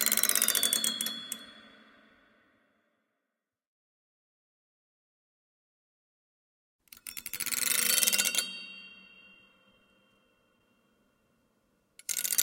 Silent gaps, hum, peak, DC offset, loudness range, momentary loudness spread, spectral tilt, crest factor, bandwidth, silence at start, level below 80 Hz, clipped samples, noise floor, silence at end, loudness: 3.67-6.79 s; none; -4 dBFS; under 0.1%; 19 LU; 21 LU; 1.5 dB/octave; 32 dB; 17 kHz; 0 s; -78 dBFS; under 0.1%; -87 dBFS; 0 s; -27 LUFS